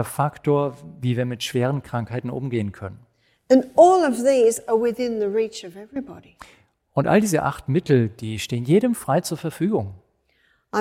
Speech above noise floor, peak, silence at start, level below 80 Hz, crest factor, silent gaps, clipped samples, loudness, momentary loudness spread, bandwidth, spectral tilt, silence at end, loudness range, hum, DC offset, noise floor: 43 dB; -2 dBFS; 0 s; -56 dBFS; 20 dB; none; under 0.1%; -21 LUFS; 13 LU; 16.5 kHz; -6 dB/octave; 0 s; 5 LU; none; under 0.1%; -64 dBFS